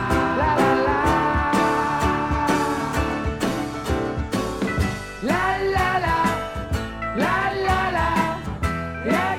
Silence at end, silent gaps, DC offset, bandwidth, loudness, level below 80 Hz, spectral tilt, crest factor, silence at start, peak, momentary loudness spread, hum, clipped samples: 0 s; none; under 0.1%; 17 kHz; -22 LUFS; -34 dBFS; -5.5 dB/octave; 16 dB; 0 s; -6 dBFS; 7 LU; none; under 0.1%